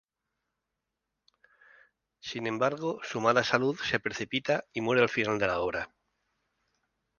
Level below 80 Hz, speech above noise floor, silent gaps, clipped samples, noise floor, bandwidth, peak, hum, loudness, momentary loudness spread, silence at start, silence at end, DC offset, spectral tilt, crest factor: -64 dBFS; 57 dB; none; under 0.1%; -86 dBFS; 7.2 kHz; -8 dBFS; none; -29 LUFS; 10 LU; 2.25 s; 1.35 s; under 0.1%; -4.5 dB/octave; 24 dB